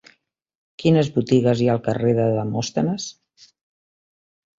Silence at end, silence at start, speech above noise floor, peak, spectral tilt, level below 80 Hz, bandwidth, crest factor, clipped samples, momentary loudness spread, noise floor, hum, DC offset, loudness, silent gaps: 1.5 s; 0.8 s; 42 dB; -4 dBFS; -6.5 dB/octave; -56 dBFS; 7.8 kHz; 18 dB; under 0.1%; 7 LU; -61 dBFS; none; under 0.1%; -20 LUFS; none